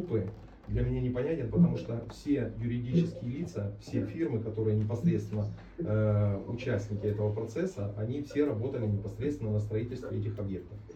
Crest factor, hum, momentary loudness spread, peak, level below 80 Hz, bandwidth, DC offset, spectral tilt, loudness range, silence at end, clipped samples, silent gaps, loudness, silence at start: 18 dB; none; 9 LU; -14 dBFS; -50 dBFS; 8 kHz; under 0.1%; -9 dB/octave; 2 LU; 0 s; under 0.1%; none; -33 LUFS; 0 s